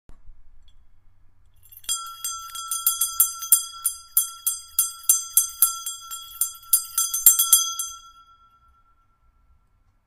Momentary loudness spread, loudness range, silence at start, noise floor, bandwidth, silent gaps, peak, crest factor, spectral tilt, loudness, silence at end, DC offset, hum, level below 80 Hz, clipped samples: 16 LU; 5 LU; 0.1 s; -62 dBFS; 16 kHz; none; 0 dBFS; 26 dB; 4 dB/octave; -20 LUFS; 1.95 s; under 0.1%; none; -56 dBFS; under 0.1%